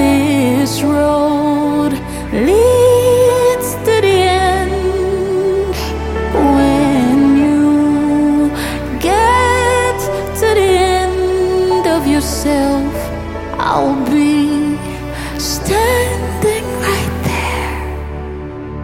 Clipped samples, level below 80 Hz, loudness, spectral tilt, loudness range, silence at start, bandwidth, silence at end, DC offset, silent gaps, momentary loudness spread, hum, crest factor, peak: under 0.1%; -28 dBFS; -13 LUFS; -5.5 dB/octave; 4 LU; 0 s; 16.5 kHz; 0 s; under 0.1%; none; 10 LU; none; 12 dB; 0 dBFS